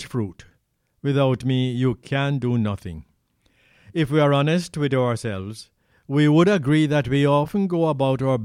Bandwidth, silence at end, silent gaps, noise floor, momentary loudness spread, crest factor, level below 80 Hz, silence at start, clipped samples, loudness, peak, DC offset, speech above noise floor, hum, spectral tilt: 12 kHz; 0 s; none; -68 dBFS; 13 LU; 16 dB; -52 dBFS; 0 s; under 0.1%; -21 LUFS; -4 dBFS; under 0.1%; 47 dB; none; -7 dB/octave